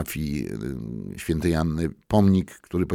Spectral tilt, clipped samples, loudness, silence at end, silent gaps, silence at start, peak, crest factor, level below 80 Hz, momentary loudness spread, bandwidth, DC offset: -7 dB/octave; under 0.1%; -25 LUFS; 0 s; none; 0 s; -6 dBFS; 18 dB; -40 dBFS; 12 LU; 17.5 kHz; under 0.1%